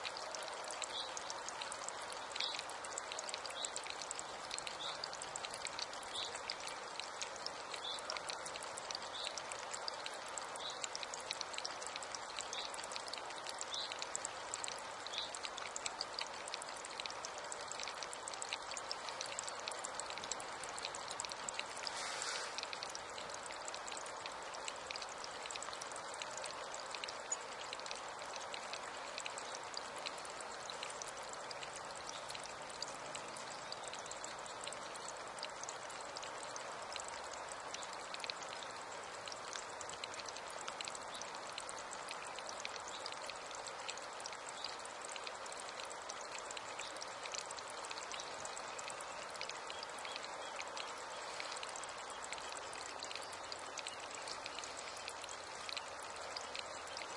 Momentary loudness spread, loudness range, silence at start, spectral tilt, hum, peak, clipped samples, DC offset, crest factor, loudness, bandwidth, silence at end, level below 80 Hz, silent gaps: 4 LU; 3 LU; 0 s; 0 dB/octave; none; -20 dBFS; under 0.1%; under 0.1%; 26 dB; -44 LUFS; 11.5 kHz; 0 s; -78 dBFS; none